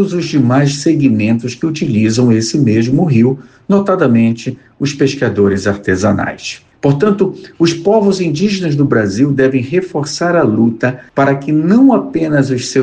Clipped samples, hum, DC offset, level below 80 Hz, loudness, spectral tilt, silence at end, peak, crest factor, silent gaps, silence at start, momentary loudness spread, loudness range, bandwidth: under 0.1%; none; under 0.1%; -48 dBFS; -13 LUFS; -6.5 dB/octave; 0 s; 0 dBFS; 12 dB; none; 0 s; 6 LU; 2 LU; 9.6 kHz